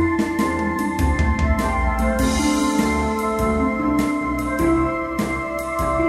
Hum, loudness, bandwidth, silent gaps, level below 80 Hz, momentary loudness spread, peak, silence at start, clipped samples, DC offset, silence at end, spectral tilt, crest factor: none; -20 LUFS; 15.5 kHz; none; -28 dBFS; 4 LU; -6 dBFS; 0 s; under 0.1%; under 0.1%; 0 s; -6 dB/octave; 12 dB